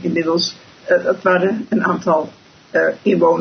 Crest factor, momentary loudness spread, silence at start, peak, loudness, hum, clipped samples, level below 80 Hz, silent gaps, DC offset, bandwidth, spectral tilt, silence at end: 16 dB; 6 LU; 0 s; -2 dBFS; -17 LUFS; none; under 0.1%; -62 dBFS; none; under 0.1%; 6.4 kHz; -5.5 dB/octave; 0 s